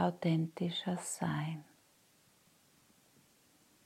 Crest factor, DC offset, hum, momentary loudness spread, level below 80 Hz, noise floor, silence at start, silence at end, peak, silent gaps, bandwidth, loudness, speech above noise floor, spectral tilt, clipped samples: 20 dB; under 0.1%; none; 7 LU; -80 dBFS; -69 dBFS; 0 s; 2.25 s; -18 dBFS; none; 15 kHz; -37 LUFS; 33 dB; -5.5 dB/octave; under 0.1%